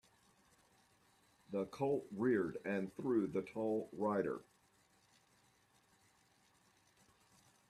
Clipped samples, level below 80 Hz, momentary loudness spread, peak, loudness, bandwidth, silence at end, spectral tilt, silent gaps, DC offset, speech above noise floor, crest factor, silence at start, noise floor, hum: under 0.1%; -80 dBFS; 7 LU; -24 dBFS; -40 LUFS; 13 kHz; 3.3 s; -7.5 dB/octave; none; under 0.1%; 35 dB; 20 dB; 1.5 s; -73 dBFS; none